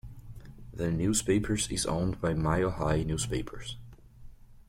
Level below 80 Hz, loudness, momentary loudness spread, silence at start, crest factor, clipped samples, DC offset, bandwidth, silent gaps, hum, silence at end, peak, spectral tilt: -44 dBFS; -30 LUFS; 20 LU; 0.05 s; 18 dB; under 0.1%; under 0.1%; 16.5 kHz; none; none; 0.1 s; -14 dBFS; -5 dB/octave